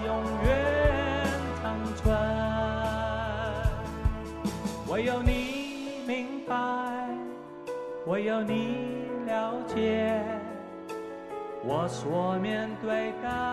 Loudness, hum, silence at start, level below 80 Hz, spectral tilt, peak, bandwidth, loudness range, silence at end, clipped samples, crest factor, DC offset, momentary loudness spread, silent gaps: -30 LUFS; none; 0 s; -40 dBFS; -6.5 dB/octave; -12 dBFS; 13.5 kHz; 4 LU; 0 s; under 0.1%; 18 dB; under 0.1%; 11 LU; none